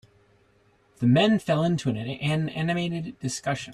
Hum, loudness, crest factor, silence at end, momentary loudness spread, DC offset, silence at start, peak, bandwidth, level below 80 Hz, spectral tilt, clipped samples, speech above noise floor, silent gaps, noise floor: none; -25 LUFS; 16 dB; 0 s; 10 LU; under 0.1%; 1 s; -10 dBFS; 13 kHz; -60 dBFS; -6 dB/octave; under 0.1%; 38 dB; none; -62 dBFS